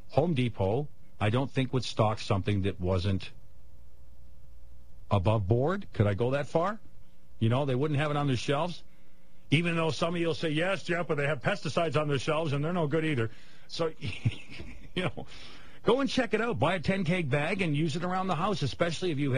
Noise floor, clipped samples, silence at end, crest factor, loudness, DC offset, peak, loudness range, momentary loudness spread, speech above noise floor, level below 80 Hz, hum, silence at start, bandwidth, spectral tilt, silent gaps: -53 dBFS; under 0.1%; 0 s; 20 dB; -30 LUFS; 1%; -10 dBFS; 4 LU; 7 LU; 24 dB; -54 dBFS; none; 0 s; 10.5 kHz; -6.5 dB/octave; none